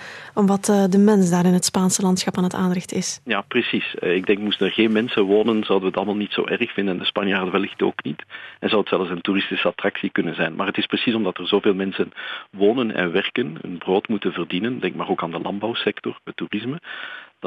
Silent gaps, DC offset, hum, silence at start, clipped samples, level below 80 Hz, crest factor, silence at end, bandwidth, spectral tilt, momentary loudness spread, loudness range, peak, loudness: none; under 0.1%; none; 0 s; under 0.1%; -64 dBFS; 14 dB; 0 s; 13 kHz; -4.5 dB/octave; 11 LU; 5 LU; -6 dBFS; -21 LUFS